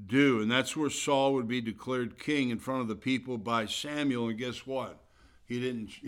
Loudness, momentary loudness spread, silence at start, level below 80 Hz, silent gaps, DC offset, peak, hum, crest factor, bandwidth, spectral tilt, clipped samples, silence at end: -31 LUFS; 10 LU; 0 s; -66 dBFS; none; under 0.1%; -12 dBFS; none; 20 dB; 16 kHz; -4.5 dB/octave; under 0.1%; 0 s